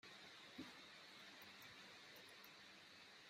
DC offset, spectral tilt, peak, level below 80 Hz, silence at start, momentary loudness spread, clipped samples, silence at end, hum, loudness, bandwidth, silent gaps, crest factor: under 0.1%; -2.5 dB/octave; -42 dBFS; under -90 dBFS; 0.05 s; 4 LU; under 0.1%; 0 s; none; -59 LUFS; 15.5 kHz; none; 20 dB